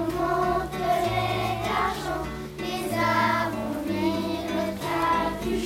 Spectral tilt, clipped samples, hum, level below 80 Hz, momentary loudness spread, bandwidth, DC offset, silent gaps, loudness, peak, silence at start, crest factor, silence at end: -5.5 dB/octave; under 0.1%; none; -44 dBFS; 7 LU; 16 kHz; under 0.1%; none; -26 LUFS; -10 dBFS; 0 s; 16 dB; 0 s